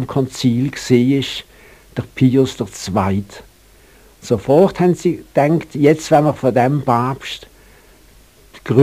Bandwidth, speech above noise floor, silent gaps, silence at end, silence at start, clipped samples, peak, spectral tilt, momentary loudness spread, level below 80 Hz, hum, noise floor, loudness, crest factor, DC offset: 15.5 kHz; 32 dB; none; 0 s; 0 s; under 0.1%; 0 dBFS; -6.5 dB/octave; 15 LU; -48 dBFS; none; -48 dBFS; -16 LUFS; 16 dB; 0.1%